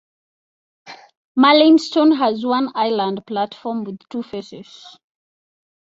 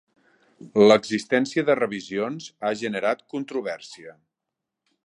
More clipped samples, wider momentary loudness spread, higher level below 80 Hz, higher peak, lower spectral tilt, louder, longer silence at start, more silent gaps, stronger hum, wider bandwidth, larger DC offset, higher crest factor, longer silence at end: neither; first, 18 LU vs 15 LU; about the same, -68 dBFS vs -72 dBFS; about the same, -2 dBFS vs -2 dBFS; about the same, -5 dB/octave vs -5 dB/octave; first, -17 LUFS vs -23 LUFS; first, 0.85 s vs 0.65 s; first, 1.17-1.35 s vs none; neither; second, 7.8 kHz vs 10.5 kHz; neither; about the same, 18 dB vs 22 dB; about the same, 0.95 s vs 0.95 s